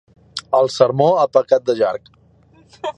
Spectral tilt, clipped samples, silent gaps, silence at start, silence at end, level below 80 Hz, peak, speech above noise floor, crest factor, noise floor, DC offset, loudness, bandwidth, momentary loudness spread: -5.5 dB/octave; under 0.1%; none; 0.35 s; 0.05 s; -60 dBFS; 0 dBFS; 35 dB; 18 dB; -51 dBFS; under 0.1%; -16 LUFS; 9.8 kHz; 17 LU